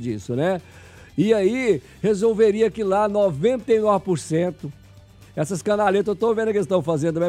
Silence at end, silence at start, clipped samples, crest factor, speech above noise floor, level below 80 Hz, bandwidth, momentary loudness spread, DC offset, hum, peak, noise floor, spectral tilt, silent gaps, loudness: 0 s; 0 s; under 0.1%; 16 dB; 27 dB; -54 dBFS; 13 kHz; 9 LU; under 0.1%; none; -6 dBFS; -47 dBFS; -6.5 dB/octave; none; -21 LUFS